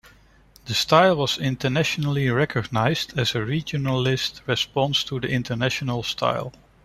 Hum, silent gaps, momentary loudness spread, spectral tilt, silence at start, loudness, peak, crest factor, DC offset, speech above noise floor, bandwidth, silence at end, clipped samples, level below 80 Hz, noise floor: none; none; 7 LU; -5 dB/octave; 0.05 s; -23 LUFS; -2 dBFS; 20 dB; under 0.1%; 31 dB; 14.5 kHz; 0.35 s; under 0.1%; -52 dBFS; -53 dBFS